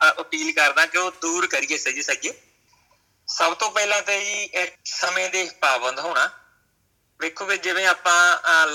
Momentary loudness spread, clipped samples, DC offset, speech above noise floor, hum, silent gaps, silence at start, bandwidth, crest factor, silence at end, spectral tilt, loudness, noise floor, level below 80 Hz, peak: 9 LU; under 0.1%; under 0.1%; 45 dB; none; none; 0 s; 17.5 kHz; 18 dB; 0 s; 1 dB/octave; -21 LUFS; -67 dBFS; -76 dBFS; -4 dBFS